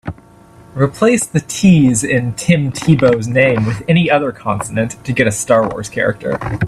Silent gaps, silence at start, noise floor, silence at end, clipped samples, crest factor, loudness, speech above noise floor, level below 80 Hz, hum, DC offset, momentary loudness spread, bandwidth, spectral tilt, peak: none; 0.05 s; -42 dBFS; 0 s; under 0.1%; 14 dB; -14 LUFS; 28 dB; -42 dBFS; none; under 0.1%; 8 LU; 13.5 kHz; -5.5 dB/octave; 0 dBFS